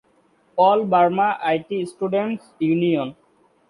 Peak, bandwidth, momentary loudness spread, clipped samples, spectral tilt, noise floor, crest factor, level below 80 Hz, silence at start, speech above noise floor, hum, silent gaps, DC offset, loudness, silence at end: -4 dBFS; 11 kHz; 11 LU; under 0.1%; -7.5 dB/octave; -60 dBFS; 16 dB; -66 dBFS; 0.55 s; 40 dB; none; none; under 0.1%; -20 LUFS; 0.55 s